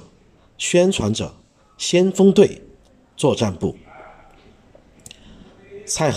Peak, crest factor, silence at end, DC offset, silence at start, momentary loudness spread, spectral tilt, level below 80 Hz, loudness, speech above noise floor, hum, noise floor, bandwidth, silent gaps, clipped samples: -2 dBFS; 20 dB; 0 s; under 0.1%; 0.6 s; 17 LU; -5 dB/octave; -50 dBFS; -18 LUFS; 36 dB; none; -53 dBFS; 14 kHz; none; under 0.1%